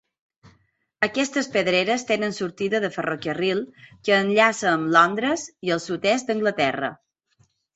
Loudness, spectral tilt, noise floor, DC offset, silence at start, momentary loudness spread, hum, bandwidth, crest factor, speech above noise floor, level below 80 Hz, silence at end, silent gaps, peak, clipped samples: -22 LUFS; -4 dB/octave; -65 dBFS; under 0.1%; 0.45 s; 10 LU; none; 8.2 kHz; 20 dB; 42 dB; -66 dBFS; 0.8 s; none; -2 dBFS; under 0.1%